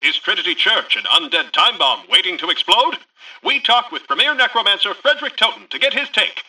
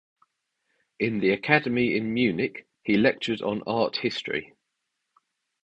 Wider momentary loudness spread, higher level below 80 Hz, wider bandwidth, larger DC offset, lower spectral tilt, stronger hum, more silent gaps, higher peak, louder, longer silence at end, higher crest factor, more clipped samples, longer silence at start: second, 5 LU vs 9 LU; second, -68 dBFS vs -62 dBFS; first, 14.5 kHz vs 8.2 kHz; neither; second, 0 dB/octave vs -6.5 dB/octave; neither; neither; about the same, -2 dBFS vs -4 dBFS; first, -15 LUFS vs -25 LUFS; second, 0.05 s vs 1.2 s; second, 16 dB vs 24 dB; neither; second, 0 s vs 1 s